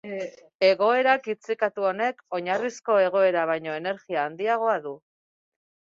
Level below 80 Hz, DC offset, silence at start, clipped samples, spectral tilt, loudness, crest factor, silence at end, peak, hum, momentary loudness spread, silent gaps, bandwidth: -76 dBFS; under 0.1%; 0.05 s; under 0.1%; -4.5 dB/octave; -25 LUFS; 18 dB; 0.9 s; -6 dBFS; none; 11 LU; 0.55-0.60 s; 7.6 kHz